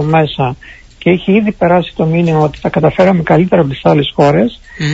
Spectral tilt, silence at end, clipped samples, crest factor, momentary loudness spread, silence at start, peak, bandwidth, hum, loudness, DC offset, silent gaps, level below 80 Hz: -7.5 dB/octave; 0 s; under 0.1%; 12 dB; 8 LU; 0 s; 0 dBFS; 8 kHz; none; -12 LUFS; under 0.1%; none; -38 dBFS